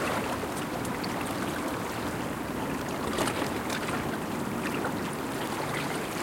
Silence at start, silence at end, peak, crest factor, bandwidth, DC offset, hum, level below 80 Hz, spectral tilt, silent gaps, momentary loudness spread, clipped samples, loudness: 0 s; 0 s; -14 dBFS; 18 dB; 17 kHz; under 0.1%; none; -54 dBFS; -4.5 dB/octave; none; 3 LU; under 0.1%; -32 LUFS